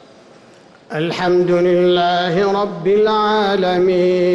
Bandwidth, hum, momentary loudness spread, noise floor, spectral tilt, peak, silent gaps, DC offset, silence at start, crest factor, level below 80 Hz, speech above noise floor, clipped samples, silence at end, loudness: 7.6 kHz; none; 5 LU; -45 dBFS; -6.5 dB/octave; -6 dBFS; none; under 0.1%; 0.9 s; 8 dB; -52 dBFS; 30 dB; under 0.1%; 0 s; -15 LUFS